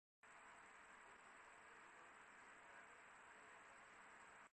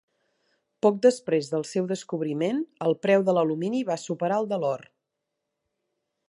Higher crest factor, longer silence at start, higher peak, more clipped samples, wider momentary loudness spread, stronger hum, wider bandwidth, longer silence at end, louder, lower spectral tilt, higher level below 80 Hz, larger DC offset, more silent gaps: second, 14 dB vs 20 dB; second, 0.25 s vs 0.85 s; second, -52 dBFS vs -6 dBFS; neither; second, 1 LU vs 9 LU; neither; second, 8.4 kHz vs 11.5 kHz; second, 0 s vs 1.5 s; second, -64 LUFS vs -26 LUFS; second, -1.5 dB/octave vs -6 dB/octave; second, under -90 dBFS vs -78 dBFS; neither; neither